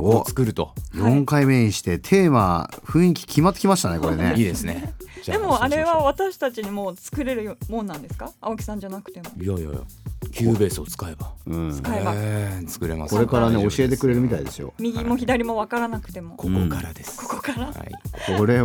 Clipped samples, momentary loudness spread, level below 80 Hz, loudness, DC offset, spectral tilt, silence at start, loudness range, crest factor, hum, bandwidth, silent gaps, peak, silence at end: under 0.1%; 15 LU; -40 dBFS; -22 LUFS; under 0.1%; -6 dB/octave; 0 s; 8 LU; 20 dB; none; over 20 kHz; none; -2 dBFS; 0 s